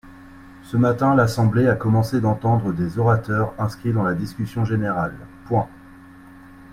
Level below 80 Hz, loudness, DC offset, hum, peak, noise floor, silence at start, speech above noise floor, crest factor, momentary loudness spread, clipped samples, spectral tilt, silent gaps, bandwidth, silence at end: -46 dBFS; -21 LUFS; under 0.1%; none; -4 dBFS; -44 dBFS; 0.05 s; 24 dB; 16 dB; 9 LU; under 0.1%; -8 dB/octave; none; 14.5 kHz; 0 s